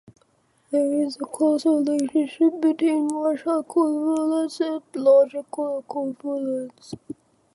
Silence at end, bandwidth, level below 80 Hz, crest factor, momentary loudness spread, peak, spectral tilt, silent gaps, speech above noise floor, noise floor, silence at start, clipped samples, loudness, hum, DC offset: 0.4 s; 11.5 kHz; -74 dBFS; 16 dB; 11 LU; -8 dBFS; -5 dB/octave; none; 42 dB; -64 dBFS; 0.7 s; under 0.1%; -23 LUFS; none; under 0.1%